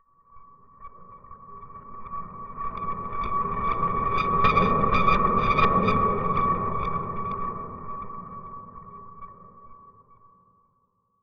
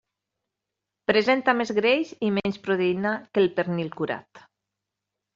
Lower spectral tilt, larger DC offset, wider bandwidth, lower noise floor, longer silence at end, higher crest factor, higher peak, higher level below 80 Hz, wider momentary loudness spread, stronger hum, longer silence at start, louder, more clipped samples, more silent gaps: first, -8 dB/octave vs -3.5 dB/octave; neither; second, 6.4 kHz vs 7.6 kHz; second, -70 dBFS vs -85 dBFS; about the same, 0.85 s vs 0.95 s; about the same, 20 dB vs 20 dB; about the same, -6 dBFS vs -6 dBFS; first, -40 dBFS vs -66 dBFS; first, 23 LU vs 9 LU; neither; second, 0 s vs 1.1 s; about the same, -25 LUFS vs -24 LUFS; neither; neither